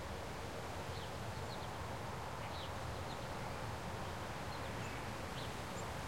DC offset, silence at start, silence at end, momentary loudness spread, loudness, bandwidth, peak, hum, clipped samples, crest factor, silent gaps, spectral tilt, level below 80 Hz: 0.2%; 0 s; 0 s; 1 LU; -45 LUFS; 16.5 kHz; -30 dBFS; none; under 0.1%; 14 dB; none; -4.5 dB/octave; -56 dBFS